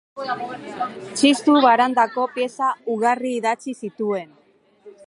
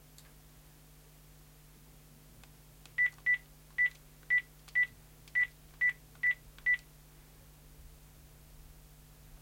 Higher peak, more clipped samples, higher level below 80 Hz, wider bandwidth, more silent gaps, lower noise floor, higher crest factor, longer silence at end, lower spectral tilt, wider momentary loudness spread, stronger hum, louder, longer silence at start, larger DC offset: first, -2 dBFS vs -22 dBFS; neither; second, -76 dBFS vs -60 dBFS; second, 11.5 kHz vs 16.5 kHz; neither; second, -50 dBFS vs -58 dBFS; about the same, 18 dB vs 16 dB; about the same, 0.15 s vs 0.05 s; about the same, -3.5 dB/octave vs -2.5 dB/octave; first, 14 LU vs 3 LU; neither; first, -20 LUFS vs -32 LUFS; second, 0.15 s vs 3 s; neither